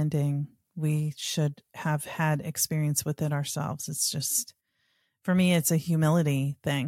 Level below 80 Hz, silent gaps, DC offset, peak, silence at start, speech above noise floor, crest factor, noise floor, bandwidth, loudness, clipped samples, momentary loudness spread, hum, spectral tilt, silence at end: -66 dBFS; none; under 0.1%; -12 dBFS; 0 s; 46 dB; 16 dB; -73 dBFS; 17 kHz; -28 LUFS; under 0.1%; 9 LU; none; -5 dB/octave; 0 s